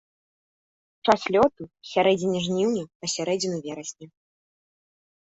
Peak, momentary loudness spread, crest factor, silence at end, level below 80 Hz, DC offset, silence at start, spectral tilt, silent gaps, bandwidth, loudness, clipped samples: -4 dBFS; 13 LU; 22 dB; 1.15 s; -62 dBFS; under 0.1%; 1.05 s; -4.5 dB/octave; 2.95-3.00 s; 8.4 kHz; -24 LUFS; under 0.1%